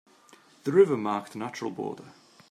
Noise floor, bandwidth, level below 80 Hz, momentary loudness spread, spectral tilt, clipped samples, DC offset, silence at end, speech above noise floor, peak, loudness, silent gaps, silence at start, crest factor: -57 dBFS; 11 kHz; -80 dBFS; 15 LU; -6.5 dB/octave; under 0.1%; under 0.1%; 0.4 s; 31 dB; -8 dBFS; -27 LUFS; none; 0.65 s; 20 dB